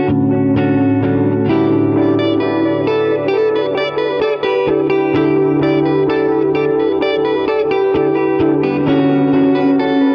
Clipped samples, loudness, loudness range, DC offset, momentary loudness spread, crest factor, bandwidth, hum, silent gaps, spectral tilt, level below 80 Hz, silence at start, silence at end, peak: under 0.1%; -14 LUFS; 1 LU; under 0.1%; 3 LU; 10 dB; 5.8 kHz; none; none; -9 dB/octave; -46 dBFS; 0 s; 0 s; -4 dBFS